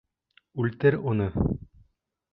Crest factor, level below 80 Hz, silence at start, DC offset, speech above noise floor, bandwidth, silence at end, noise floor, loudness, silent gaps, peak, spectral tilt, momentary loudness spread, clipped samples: 20 dB; -42 dBFS; 0.55 s; under 0.1%; 41 dB; 5.2 kHz; 0.7 s; -66 dBFS; -27 LUFS; none; -8 dBFS; -11.5 dB/octave; 11 LU; under 0.1%